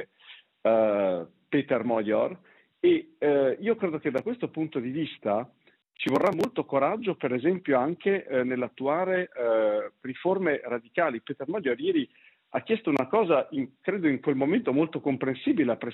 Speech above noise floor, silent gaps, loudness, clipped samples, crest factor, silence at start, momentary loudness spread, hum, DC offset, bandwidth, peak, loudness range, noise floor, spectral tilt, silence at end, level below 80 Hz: 27 dB; none; -27 LUFS; under 0.1%; 16 dB; 0 s; 7 LU; none; under 0.1%; 7.6 kHz; -10 dBFS; 2 LU; -53 dBFS; -5 dB/octave; 0 s; -76 dBFS